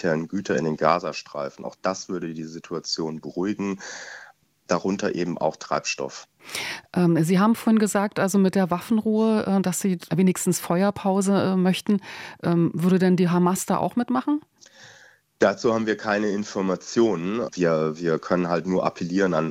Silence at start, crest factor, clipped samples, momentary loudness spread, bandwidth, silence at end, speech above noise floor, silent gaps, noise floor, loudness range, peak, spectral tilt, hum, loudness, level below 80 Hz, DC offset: 0 s; 20 dB; under 0.1%; 11 LU; 16 kHz; 0 s; 30 dB; none; -53 dBFS; 7 LU; -4 dBFS; -6 dB/octave; none; -23 LUFS; -64 dBFS; under 0.1%